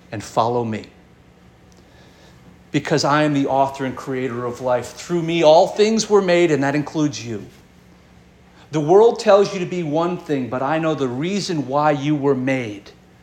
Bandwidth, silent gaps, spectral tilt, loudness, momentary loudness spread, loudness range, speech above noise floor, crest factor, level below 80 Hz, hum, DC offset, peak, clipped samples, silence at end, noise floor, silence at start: 12.5 kHz; none; -5.5 dB/octave; -19 LUFS; 12 LU; 5 LU; 31 dB; 18 dB; -56 dBFS; none; under 0.1%; -2 dBFS; under 0.1%; 0.3 s; -49 dBFS; 0.1 s